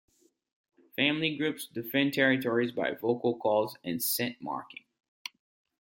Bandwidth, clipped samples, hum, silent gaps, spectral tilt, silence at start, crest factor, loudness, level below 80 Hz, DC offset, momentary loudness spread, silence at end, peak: 17 kHz; under 0.1%; none; none; -4 dB/octave; 1 s; 22 dB; -29 LUFS; -76 dBFS; under 0.1%; 19 LU; 1.1 s; -10 dBFS